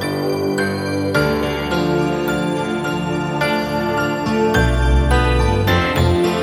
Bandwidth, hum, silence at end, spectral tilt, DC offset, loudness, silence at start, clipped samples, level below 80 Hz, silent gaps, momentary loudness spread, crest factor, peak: 16 kHz; none; 0 s; -6 dB/octave; under 0.1%; -18 LUFS; 0 s; under 0.1%; -24 dBFS; none; 5 LU; 14 dB; -2 dBFS